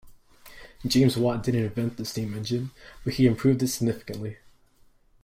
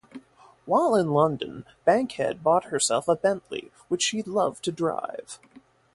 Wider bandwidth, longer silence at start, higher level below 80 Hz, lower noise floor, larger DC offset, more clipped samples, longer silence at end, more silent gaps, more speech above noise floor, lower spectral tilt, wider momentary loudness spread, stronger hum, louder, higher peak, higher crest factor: first, 16 kHz vs 11.5 kHz; about the same, 0.05 s vs 0.15 s; first, -50 dBFS vs -66 dBFS; first, -59 dBFS vs -52 dBFS; neither; neither; first, 0.9 s vs 0.6 s; neither; first, 34 dB vs 27 dB; first, -6 dB/octave vs -4 dB/octave; about the same, 14 LU vs 15 LU; neither; about the same, -26 LUFS vs -25 LUFS; about the same, -8 dBFS vs -8 dBFS; about the same, 18 dB vs 18 dB